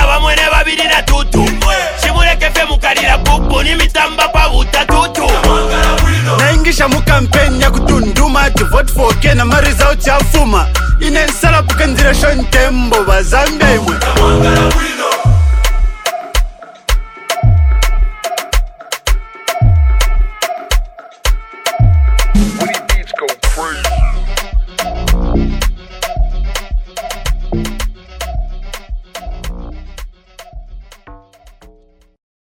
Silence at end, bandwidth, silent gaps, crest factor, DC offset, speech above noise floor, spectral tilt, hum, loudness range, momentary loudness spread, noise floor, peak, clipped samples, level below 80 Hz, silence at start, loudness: 1.25 s; 17 kHz; none; 10 dB; under 0.1%; 37 dB; -4.5 dB/octave; none; 12 LU; 12 LU; -46 dBFS; 0 dBFS; 0.3%; -14 dBFS; 0 s; -12 LUFS